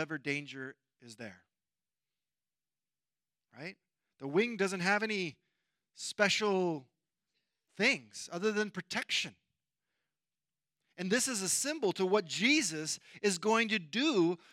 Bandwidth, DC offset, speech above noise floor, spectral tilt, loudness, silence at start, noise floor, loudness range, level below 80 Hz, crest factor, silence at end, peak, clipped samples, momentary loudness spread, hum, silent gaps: 16 kHz; under 0.1%; over 57 dB; -3 dB/octave; -32 LUFS; 0 s; under -90 dBFS; 14 LU; -88 dBFS; 24 dB; 0.15 s; -12 dBFS; under 0.1%; 17 LU; none; none